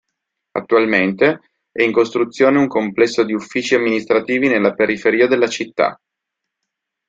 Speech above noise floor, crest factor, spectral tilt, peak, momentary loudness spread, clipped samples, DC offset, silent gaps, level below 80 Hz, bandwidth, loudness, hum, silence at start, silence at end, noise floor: 64 dB; 16 dB; -5 dB/octave; -2 dBFS; 6 LU; under 0.1%; under 0.1%; none; -60 dBFS; 7.8 kHz; -16 LUFS; none; 0.55 s; 1.15 s; -80 dBFS